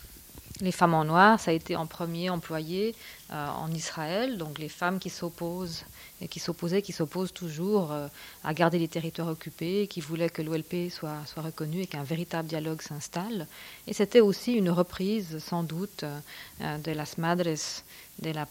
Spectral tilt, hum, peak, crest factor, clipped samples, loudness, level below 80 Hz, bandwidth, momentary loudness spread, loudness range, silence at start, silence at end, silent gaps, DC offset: -5.5 dB/octave; none; -6 dBFS; 24 dB; under 0.1%; -30 LUFS; -60 dBFS; 17 kHz; 13 LU; 7 LU; 0 s; 0 s; none; under 0.1%